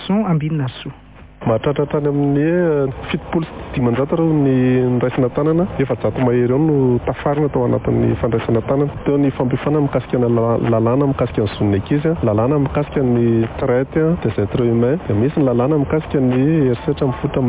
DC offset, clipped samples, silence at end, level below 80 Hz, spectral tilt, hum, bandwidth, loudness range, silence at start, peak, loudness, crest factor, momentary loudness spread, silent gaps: under 0.1%; under 0.1%; 0 s; -38 dBFS; -12.5 dB/octave; none; 4 kHz; 1 LU; 0 s; -4 dBFS; -17 LUFS; 12 dB; 4 LU; none